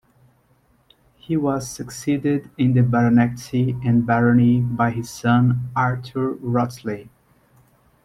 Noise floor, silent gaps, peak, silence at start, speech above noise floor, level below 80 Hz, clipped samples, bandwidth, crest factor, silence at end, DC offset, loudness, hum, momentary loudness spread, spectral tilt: -60 dBFS; none; -4 dBFS; 1.3 s; 41 dB; -52 dBFS; under 0.1%; 13.5 kHz; 16 dB; 1 s; under 0.1%; -20 LUFS; none; 10 LU; -7.5 dB/octave